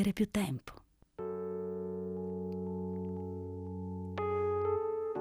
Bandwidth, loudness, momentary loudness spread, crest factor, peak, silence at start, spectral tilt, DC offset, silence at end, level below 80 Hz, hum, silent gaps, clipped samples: 16 kHz; -37 LUFS; 9 LU; 16 dB; -20 dBFS; 0 s; -7 dB/octave; under 0.1%; 0 s; -64 dBFS; none; none; under 0.1%